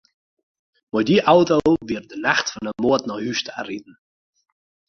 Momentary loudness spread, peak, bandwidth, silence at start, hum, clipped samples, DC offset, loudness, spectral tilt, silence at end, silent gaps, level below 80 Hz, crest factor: 14 LU; -2 dBFS; 7.2 kHz; 0.95 s; none; under 0.1%; under 0.1%; -20 LUFS; -5 dB/octave; 1.05 s; none; -54 dBFS; 20 dB